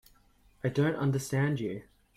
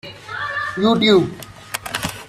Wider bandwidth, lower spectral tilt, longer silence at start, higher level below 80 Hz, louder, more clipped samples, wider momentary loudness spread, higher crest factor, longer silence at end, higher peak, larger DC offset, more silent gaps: about the same, 15 kHz vs 16 kHz; first, -6.5 dB/octave vs -4.5 dB/octave; first, 0.65 s vs 0.05 s; second, -62 dBFS vs -50 dBFS; second, -31 LUFS vs -18 LUFS; neither; second, 9 LU vs 16 LU; about the same, 16 dB vs 18 dB; first, 0.35 s vs 0 s; second, -16 dBFS vs -2 dBFS; neither; neither